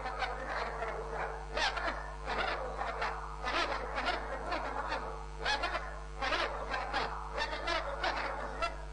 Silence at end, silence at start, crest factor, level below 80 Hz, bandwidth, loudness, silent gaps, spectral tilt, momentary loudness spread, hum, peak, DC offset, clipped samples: 0 s; 0 s; 18 dB; -46 dBFS; 10 kHz; -36 LUFS; none; -3.5 dB/octave; 5 LU; none; -18 dBFS; under 0.1%; under 0.1%